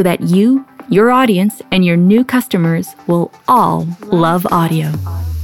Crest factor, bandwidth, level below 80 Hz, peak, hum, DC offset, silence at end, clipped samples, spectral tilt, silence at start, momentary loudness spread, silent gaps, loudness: 12 dB; 17.5 kHz; -36 dBFS; -2 dBFS; none; under 0.1%; 0 s; under 0.1%; -7 dB/octave; 0 s; 7 LU; none; -13 LUFS